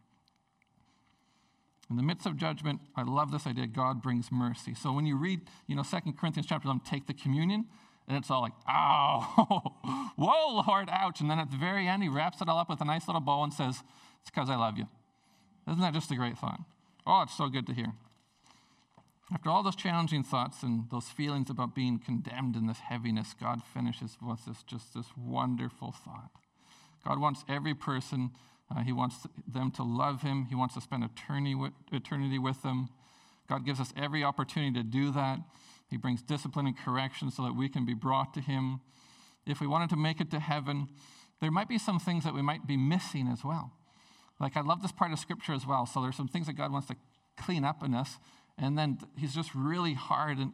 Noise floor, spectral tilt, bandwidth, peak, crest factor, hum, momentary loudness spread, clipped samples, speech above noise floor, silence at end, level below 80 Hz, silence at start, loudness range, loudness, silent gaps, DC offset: -72 dBFS; -6.5 dB/octave; 12.5 kHz; -8 dBFS; 24 dB; none; 11 LU; under 0.1%; 40 dB; 0 s; -72 dBFS; 1.9 s; 6 LU; -33 LUFS; none; under 0.1%